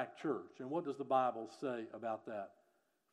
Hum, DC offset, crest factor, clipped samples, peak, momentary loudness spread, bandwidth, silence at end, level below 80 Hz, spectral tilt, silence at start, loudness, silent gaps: none; under 0.1%; 20 dB; under 0.1%; -22 dBFS; 11 LU; 11 kHz; 0.65 s; under -90 dBFS; -6.5 dB/octave; 0 s; -41 LUFS; none